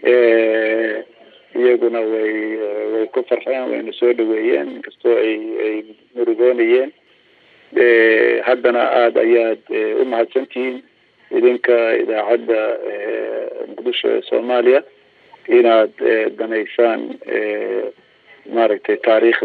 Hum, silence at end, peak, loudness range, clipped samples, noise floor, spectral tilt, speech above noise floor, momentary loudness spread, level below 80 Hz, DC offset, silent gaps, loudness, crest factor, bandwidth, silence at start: none; 0 s; -2 dBFS; 4 LU; under 0.1%; -53 dBFS; -6.5 dB/octave; 37 dB; 11 LU; -76 dBFS; under 0.1%; none; -17 LUFS; 14 dB; 4.6 kHz; 0 s